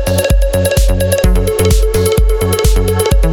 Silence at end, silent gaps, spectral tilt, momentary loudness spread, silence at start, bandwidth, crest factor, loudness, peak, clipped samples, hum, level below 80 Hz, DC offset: 0 s; none; -5 dB/octave; 1 LU; 0 s; over 20 kHz; 10 dB; -12 LUFS; 0 dBFS; under 0.1%; none; -14 dBFS; under 0.1%